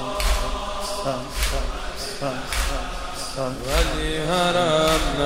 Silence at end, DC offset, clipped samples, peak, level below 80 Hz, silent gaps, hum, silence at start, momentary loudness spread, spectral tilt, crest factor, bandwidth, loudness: 0 s; 0.4%; under 0.1%; -6 dBFS; -28 dBFS; none; none; 0 s; 11 LU; -3.5 dB/octave; 16 dB; 16 kHz; -24 LUFS